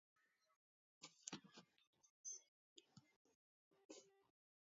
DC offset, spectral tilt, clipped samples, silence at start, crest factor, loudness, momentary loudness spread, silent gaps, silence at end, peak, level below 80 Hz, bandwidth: under 0.1%; -2.5 dB/octave; under 0.1%; 0.2 s; 36 dB; -59 LUFS; 14 LU; 0.56-1.01 s, 1.87-1.93 s, 2.10-2.24 s, 2.48-2.76 s, 3.16-3.25 s, 3.35-3.71 s, 3.85-3.89 s; 0.45 s; -30 dBFS; under -90 dBFS; 7.4 kHz